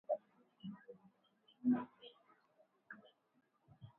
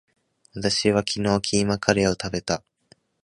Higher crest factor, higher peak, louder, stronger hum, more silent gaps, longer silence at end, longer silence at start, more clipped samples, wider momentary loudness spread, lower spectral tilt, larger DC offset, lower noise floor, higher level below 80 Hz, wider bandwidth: about the same, 20 dB vs 24 dB; second, -26 dBFS vs 0 dBFS; second, -42 LUFS vs -23 LUFS; neither; neither; second, 0.1 s vs 0.65 s; second, 0.1 s vs 0.55 s; neither; first, 24 LU vs 8 LU; first, -6 dB/octave vs -4 dB/octave; neither; first, -79 dBFS vs -60 dBFS; second, -88 dBFS vs -48 dBFS; second, 3.9 kHz vs 11.5 kHz